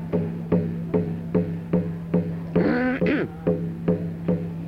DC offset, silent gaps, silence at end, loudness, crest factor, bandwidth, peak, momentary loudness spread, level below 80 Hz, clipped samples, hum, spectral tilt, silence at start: under 0.1%; none; 0 s; -25 LUFS; 16 dB; 5.2 kHz; -8 dBFS; 4 LU; -50 dBFS; under 0.1%; none; -10 dB/octave; 0 s